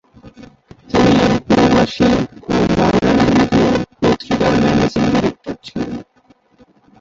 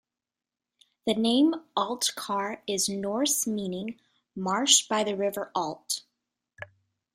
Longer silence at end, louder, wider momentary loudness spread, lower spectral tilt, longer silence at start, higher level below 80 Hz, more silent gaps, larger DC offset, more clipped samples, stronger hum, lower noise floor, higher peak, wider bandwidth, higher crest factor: first, 1 s vs 0.5 s; first, -14 LUFS vs -27 LUFS; second, 12 LU vs 17 LU; first, -6.5 dB/octave vs -2.5 dB/octave; second, 0.25 s vs 1.05 s; first, -36 dBFS vs -72 dBFS; neither; neither; neither; neither; second, -53 dBFS vs under -90 dBFS; about the same, -2 dBFS vs -4 dBFS; second, 7.8 kHz vs 16 kHz; second, 14 dB vs 24 dB